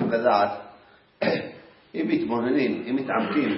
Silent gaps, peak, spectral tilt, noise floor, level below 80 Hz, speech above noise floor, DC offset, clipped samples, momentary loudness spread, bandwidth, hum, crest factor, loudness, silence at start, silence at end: none; -6 dBFS; -10 dB/octave; -54 dBFS; -66 dBFS; 30 dB; under 0.1%; under 0.1%; 11 LU; 5.8 kHz; none; 18 dB; -25 LUFS; 0 s; 0 s